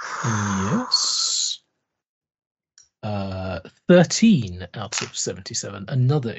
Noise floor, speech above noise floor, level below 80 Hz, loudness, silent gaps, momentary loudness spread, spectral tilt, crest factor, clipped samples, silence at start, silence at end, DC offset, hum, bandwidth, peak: -76 dBFS; 55 dB; -58 dBFS; -21 LUFS; 2.09-2.21 s, 2.46-2.55 s; 15 LU; -4.5 dB/octave; 20 dB; under 0.1%; 0 s; 0 s; under 0.1%; none; 8.2 kHz; -2 dBFS